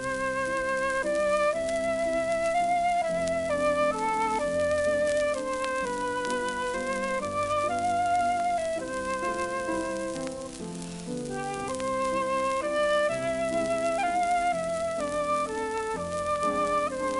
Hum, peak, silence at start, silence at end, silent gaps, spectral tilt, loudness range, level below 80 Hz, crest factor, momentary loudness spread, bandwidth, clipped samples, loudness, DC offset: none; -12 dBFS; 0 s; 0 s; none; -4 dB/octave; 4 LU; -54 dBFS; 14 dB; 6 LU; 11.5 kHz; under 0.1%; -28 LUFS; under 0.1%